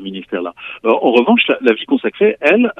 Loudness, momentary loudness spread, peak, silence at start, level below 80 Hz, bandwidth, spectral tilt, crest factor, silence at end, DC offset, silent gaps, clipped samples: -14 LUFS; 12 LU; 0 dBFS; 0 s; -64 dBFS; 5.8 kHz; -6.5 dB/octave; 14 dB; 0.05 s; under 0.1%; none; under 0.1%